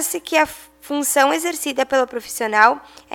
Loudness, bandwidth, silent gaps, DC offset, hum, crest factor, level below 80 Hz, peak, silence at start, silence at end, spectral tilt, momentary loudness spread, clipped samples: -18 LUFS; 19 kHz; none; under 0.1%; none; 20 dB; -58 dBFS; 0 dBFS; 0 s; 0.35 s; -1 dB/octave; 11 LU; under 0.1%